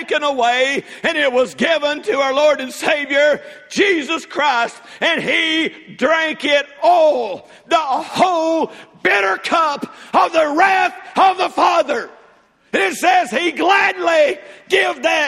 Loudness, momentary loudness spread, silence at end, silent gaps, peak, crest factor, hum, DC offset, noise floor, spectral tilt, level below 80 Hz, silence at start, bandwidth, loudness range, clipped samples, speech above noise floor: -16 LUFS; 7 LU; 0 s; none; 0 dBFS; 16 dB; none; under 0.1%; -51 dBFS; -2.5 dB/octave; -64 dBFS; 0 s; 15 kHz; 1 LU; under 0.1%; 35 dB